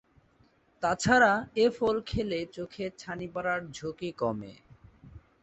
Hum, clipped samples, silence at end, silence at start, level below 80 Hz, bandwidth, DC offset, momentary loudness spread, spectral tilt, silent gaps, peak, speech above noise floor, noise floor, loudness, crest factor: none; under 0.1%; 0.25 s; 0.8 s; -54 dBFS; 8.2 kHz; under 0.1%; 17 LU; -4.5 dB/octave; none; -8 dBFS; 36 dB; -65 dBFS; -29 LUFS; 22 dB